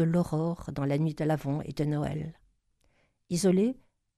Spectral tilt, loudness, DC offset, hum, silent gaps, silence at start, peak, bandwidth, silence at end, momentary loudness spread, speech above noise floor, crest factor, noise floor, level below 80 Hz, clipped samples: -7 dB/octave; -30 LUFS; under 0.1%; none; none; 0 s; -14 dBFS; 13.5 kHz; 0.45 s; 9 LU; 42 dB; 16 dB; -70 dBFS; -56 dBFS; under 0.1%